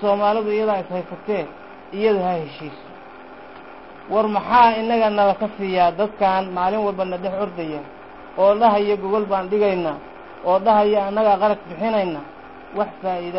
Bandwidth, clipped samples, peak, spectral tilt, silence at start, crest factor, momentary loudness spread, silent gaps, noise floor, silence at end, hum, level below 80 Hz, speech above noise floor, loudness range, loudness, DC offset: 5.8 kHz; under 0.1%; -4 dBFS; -10.5 dB/octave; 0 s; 16 dB; 24 LU; none; -40 dBFS; 0 s; none; -56 dBFS; 21 dB; 6 LU; -20 LUFS; 0.3%